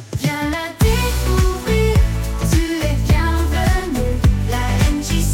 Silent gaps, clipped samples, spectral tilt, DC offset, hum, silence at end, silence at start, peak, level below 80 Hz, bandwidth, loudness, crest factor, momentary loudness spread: none; under 0.1%; -5.5 dB/octave; under 0.1%; none; 0 s; 0 s; -4 dBFS; -20 dBFS; 17 kHz; -18 LUFS; 12 dB; 4 LU